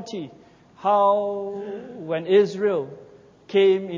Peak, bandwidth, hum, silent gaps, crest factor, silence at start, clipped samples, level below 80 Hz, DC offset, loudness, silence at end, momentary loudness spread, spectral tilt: -8 dBFS; 7.4 kHz; none; none; 16 dB; 0 s; under 0.1%; -70 dBFS; under 0.1%; -22 LUFS; 0 s; 16 LU; -6.5 dB/octave